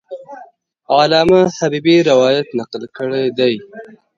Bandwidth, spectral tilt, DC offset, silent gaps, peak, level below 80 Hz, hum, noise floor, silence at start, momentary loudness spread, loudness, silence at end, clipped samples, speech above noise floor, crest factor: 7.6 kHz; -5.5 dB/octave; under 0.1%; none; 0 dBFS; -52 dBFS; none; -43 dBFS; 0.1 s; 15 LU; -14 LUFS; 0.3 s; under 0.1%; 29 dB; 14 dB